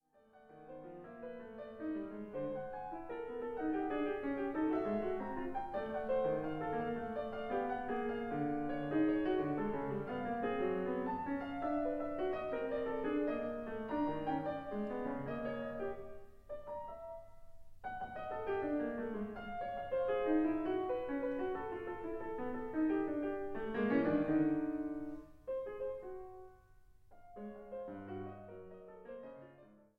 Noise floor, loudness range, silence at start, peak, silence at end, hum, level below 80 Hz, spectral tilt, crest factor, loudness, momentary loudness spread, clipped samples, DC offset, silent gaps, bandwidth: -65 dBFS; 9 LU; 0.35 s; -22 dBFS; 0.2 s; none; -62 dBFS; -8.5 dB/octave; 18 dB; -39 LUFS; 16 LU; under 0.1%; under 0.1%; none; 5 kHz